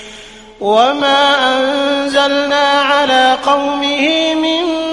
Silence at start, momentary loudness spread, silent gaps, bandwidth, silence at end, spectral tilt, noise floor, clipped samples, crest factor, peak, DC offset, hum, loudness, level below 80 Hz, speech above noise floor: 0 s; 4 LU; none; 11.5 kHz; 0 s; -2.5 dB/octave; -35 dBFS; under 0.1%; 12 dB; 0 dBFS; under 0.1%; none; -12 LUFS; -48 dBFS; 23 dB